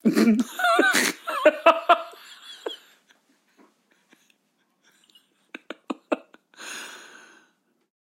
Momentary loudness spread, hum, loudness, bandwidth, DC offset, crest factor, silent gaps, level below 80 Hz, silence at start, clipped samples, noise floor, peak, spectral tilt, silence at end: 23 LU; none; -21 LUFS; 16 kHz; under 0.1%; 26 dB; none; -74 dBFS; 0.05 s; under 0.1%; -70 dBFS; 0 dBFS; -3.5 dB/octave; 1.2 s